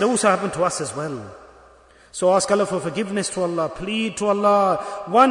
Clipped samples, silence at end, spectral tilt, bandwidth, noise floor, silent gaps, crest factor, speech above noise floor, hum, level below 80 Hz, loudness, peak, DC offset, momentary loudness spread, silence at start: under 0.1%; 0 s; -4 dB/octave; 11 kHz; -50 dBFS; none; 18 dB; 30 dB; none; -54 dBFS; -21 LUFS; -4 dBFS; under 0.1%; 11 LU; 0 s